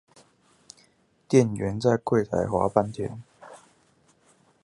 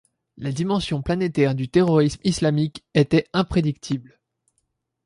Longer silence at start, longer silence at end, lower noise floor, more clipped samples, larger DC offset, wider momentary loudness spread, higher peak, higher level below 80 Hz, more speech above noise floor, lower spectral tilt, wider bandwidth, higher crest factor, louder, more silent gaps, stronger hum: first, 1.3 s vs 0.4 s; about the same, 1.05 s vs 1.05 s; second, -63 dBFS vs -74 dBFS; neither; neither; first, 13 LU vs 10 LU; about the same, -4 dBFS vs -4 dBFS; second, -54 dBFS vs -46 dBFS; second, 40 dB vs 53 dB; about the same, -7 dB/octave vs -6.5 dB/octave; about the same, 11.5 kHz vs 11.5 kHz; first, 24 dB vs 18 dB; second, -25 LUFS vs -22 LUFS; neither; neither